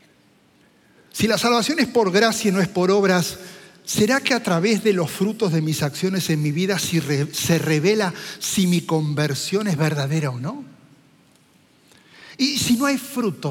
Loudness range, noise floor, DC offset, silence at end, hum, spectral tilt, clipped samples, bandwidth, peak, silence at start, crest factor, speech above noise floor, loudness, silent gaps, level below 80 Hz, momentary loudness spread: 6 LU; -57 dBFS; under 0.1%; 0 s; none; -4.5 dB/octave; under 0.1%; 17 kHz; -2 dBFS; 1.15 s; 18 dB; 36 dB; -20 LUFS; none; -58 dBFS; 8 LU